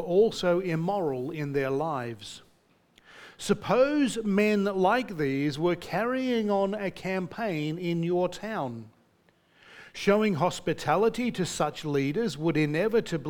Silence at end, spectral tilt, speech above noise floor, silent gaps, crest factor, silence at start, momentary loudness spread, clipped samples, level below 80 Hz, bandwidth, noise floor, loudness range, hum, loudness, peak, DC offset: 0 s; -6 dB/octave; 38 dB; none; 18 dB; 0 s; 9 LU; under 0.1%; -58 dBFS; 18.5 kHz; -65 dBFS; 5 LU; none; -28 LUFS; -10 dBFS; under 0.1%